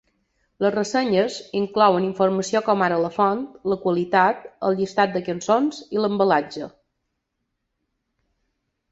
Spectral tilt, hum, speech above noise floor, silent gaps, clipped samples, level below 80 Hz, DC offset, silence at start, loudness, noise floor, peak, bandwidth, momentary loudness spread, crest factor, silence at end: -5.5 dB/octave; none; 56 dB; none; under 0.1%; -64 dBFS; under 0.1%; 0.6 s; -21 LUFS; -77 dBFS; -4 dBFS; 8 kHz; 8 LU; 20 dB; 2.2 s